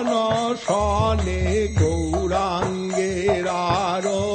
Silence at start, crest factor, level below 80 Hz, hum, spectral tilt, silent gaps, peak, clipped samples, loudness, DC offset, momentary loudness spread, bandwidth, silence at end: 0 s; 14 dB; -32 dBFS; none; -5.5 dB/octave; none; -6 dBFS; under 0.1%; -22 LUFS; under 0.1%; 3 LU; 8.8 kHz; 0 s